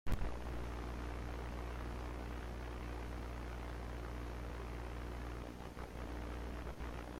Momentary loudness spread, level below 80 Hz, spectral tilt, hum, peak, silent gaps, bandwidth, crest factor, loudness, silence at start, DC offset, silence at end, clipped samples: 2 LU; -46 dBFS; -6.5 dB/octave; 60 Hz at -45 dBFS; -26 dBFS; none; 15.5 kHz; 16 dB; -47 LUFS; 0.05 s; under 0.1%; 0 s; under 0.1%